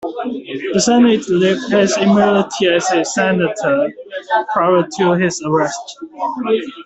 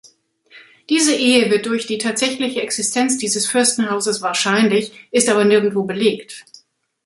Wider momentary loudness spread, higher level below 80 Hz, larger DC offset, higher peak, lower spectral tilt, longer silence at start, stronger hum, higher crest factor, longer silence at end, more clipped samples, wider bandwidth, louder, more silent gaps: first, 11 LU vs 7 LU; first, -56 dBFS vs -64 dBFS; neither; about the same, -2 dBFS vs 0 dBFS; first, -4.5 dB/octave vs -3 dB/octave; second, 0 s vs 0.55 s; neither; about the same, 14 dB vs 18 dB; second, 0 s vs 0.65 s; neither; second, 8.4 kHz vs 12 kHz; about the same, -15 LUFS vs -17 LUFS; neither